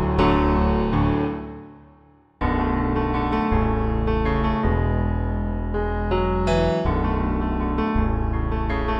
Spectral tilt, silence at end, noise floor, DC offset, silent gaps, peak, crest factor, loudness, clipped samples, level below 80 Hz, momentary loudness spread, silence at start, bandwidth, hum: -8.5 dB/octave; 0 s; -53 dBFS; under 0.1%; none; -8 dBFS; 14 dB; -23 LUFS; under 0.1%; -26 dBFS; 6 LU; 0 s; 7.8 kHz; none